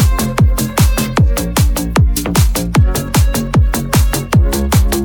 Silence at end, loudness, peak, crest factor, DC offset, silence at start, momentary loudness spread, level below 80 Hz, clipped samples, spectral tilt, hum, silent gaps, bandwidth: 0 s; -14 LUFS; 0 dBFS; 12 dB; under 0.1%; 0 s; 1 LU; -16 dBFS; under 0.1%; -5 dB/octave; none; none; 19.5 kHz